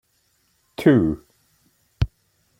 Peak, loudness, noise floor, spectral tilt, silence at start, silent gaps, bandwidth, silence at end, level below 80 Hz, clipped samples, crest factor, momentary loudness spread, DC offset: -4 dBFS; -21 LUFS; -66 dBFS; -8.5 dB/octave; 0.8 s; none; 16 kHz; 0.55 s; -40 dBFS; under 0.1%; 20 dB; 17 LU; under 0.1%